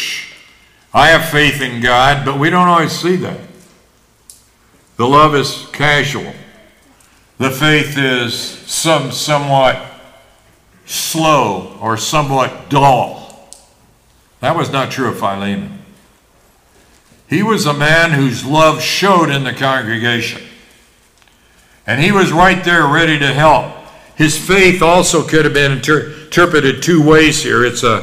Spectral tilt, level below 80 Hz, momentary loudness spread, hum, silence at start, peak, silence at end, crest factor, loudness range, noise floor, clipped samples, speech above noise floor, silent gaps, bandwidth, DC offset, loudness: -4 dB/octave; -38 dBFS; 11 LU; none; 0 s; 0 dBFS; 0 s; 14 dB; 6 LU; -51 dBFS; under 0.1%; 39 dB; none; 16 kHz; under 0.1%; -12 LUFS